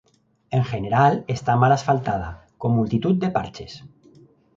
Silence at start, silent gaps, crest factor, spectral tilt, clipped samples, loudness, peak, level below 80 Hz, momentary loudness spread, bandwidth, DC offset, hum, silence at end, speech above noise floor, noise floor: 0.5 s; none; 18 dB; -7.5 dB/octave; under 0.1%; -21 LUFS; -4 dBFS; -48 dBFS; 17 LU; 7.6 kHz; under 0.1%; none; 0.7 s; 32 dB; -53 dBFS